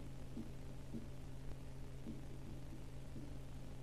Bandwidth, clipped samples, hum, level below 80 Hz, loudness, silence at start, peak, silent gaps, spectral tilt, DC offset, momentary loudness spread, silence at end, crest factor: 14 kHz; under 0.1%; none; -54 dBFS; -53 LUFS; 0 s; -34 dBFS; none; -6.5 dB/octave; 0.3%; 2 LU; 0 s; 14 dB